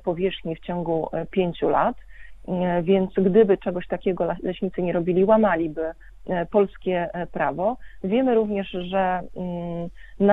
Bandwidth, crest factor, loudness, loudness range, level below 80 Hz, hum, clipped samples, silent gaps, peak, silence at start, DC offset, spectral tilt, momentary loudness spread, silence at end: 4 kHz; 18 dB; -24 LUFS; 3 LU; -48 dBFS; none; under 0.1%; none; -4 dBFS; 0.05 s; under 0.1%; -9.5 dB/octave; 12 LU; 0 s